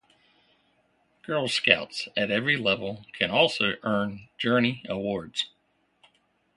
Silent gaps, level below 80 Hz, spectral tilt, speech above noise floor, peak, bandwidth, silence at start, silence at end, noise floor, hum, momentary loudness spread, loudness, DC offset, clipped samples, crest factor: none; -62 dBFS; -4.5 dB/octave; 41 dB; 0 dBFS; 11.5 kHz; 1.3 s; 1.1 s; -68 dBFS; none; 10 LU; -26 LUFS; under 0.1%; under 0.1%; 28 dB